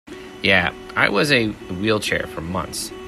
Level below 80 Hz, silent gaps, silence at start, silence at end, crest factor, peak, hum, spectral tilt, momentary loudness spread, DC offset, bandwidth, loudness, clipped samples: -48 dBFS; none; 0.05 s; 0 s; 20 dB; 0 dBFS; none; -4 dB/octave; 10 LU; under 0.1%; 14 kHz; -20 LUFS; under 0.1%